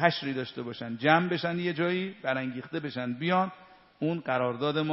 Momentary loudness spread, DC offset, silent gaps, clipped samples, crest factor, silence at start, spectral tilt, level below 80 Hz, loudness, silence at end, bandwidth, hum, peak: 10 LU; under 0.1%; none; under 0.1%; 22 dB; 0 s; -4 dB/octave; -74 dBFS; -30 LUFS; 0 s; 5.8 kHz; none; -6 dBFS